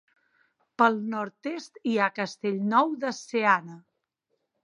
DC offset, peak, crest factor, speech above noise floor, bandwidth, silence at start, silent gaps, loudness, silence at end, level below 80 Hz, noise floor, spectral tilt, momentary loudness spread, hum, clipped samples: under 0.1%; -6 dBFS; 22 dB; 52 dB; 10.5 kHz; 0.8 s; none; -26 LUFS; 0.85 s; -82 dBFS; -79 dBFS; -5 dB/octave; 12 LU; none; under 0.1%